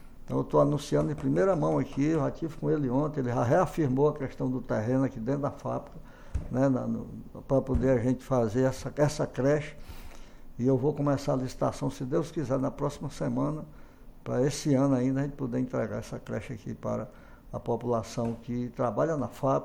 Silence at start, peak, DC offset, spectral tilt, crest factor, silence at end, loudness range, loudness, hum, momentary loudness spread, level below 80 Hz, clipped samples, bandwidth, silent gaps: 0 s; -12 dBFS; under 0.1%; -7.5 dB/octave; 18 dB; 0 s; 4 LU; -29 LUFS; none; 11 LU; -46 dBFS; under 0.1%; 16 kHz; none